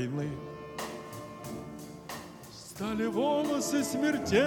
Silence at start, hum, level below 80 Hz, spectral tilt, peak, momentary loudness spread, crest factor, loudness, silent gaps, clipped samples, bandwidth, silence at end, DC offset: 0 s; none; -60 dBFS; -4.5 dB/octave; -14 dBFS; 16 LU; 20 dB; -33 LUFS; none; under 0.1%; 19 kHz; 0 s; under 0.1%